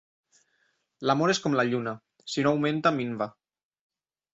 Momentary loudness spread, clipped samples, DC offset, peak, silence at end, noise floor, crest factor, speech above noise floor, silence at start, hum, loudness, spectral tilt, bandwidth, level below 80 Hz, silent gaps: 10 LU; under 0.1%; under 0.1%; -10 dBFS; 1.05 s; -72 dBFS; 20 dB; 46 dB; 1 s; none; -27 LUFS; -5 dB/octave; 8 kHz; -68 dBFS; none